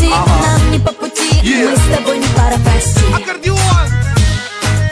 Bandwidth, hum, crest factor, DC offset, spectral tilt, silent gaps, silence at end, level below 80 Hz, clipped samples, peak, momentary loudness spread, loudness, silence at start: 11 kHz; none; 10 dB; under 0.1%; -5 dB/octave; none; 0 s; -16 dBFS; under 0.1%; 0 dBFS; 5 LU; -12 LUFS; 0 s